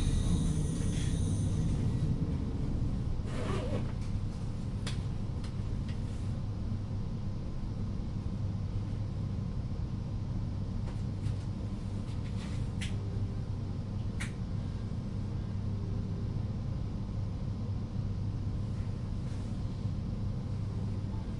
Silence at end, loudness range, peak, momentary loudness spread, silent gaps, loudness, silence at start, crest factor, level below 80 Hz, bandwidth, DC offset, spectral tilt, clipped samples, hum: 0 s; 4 LU; -18 dBFS; 5 LU; none; -36 LUFS; 0 s; 16 dB; -40 dBFS; 11.5 kHz; under 0.1%; -7 dB/octave; under 0.1%; none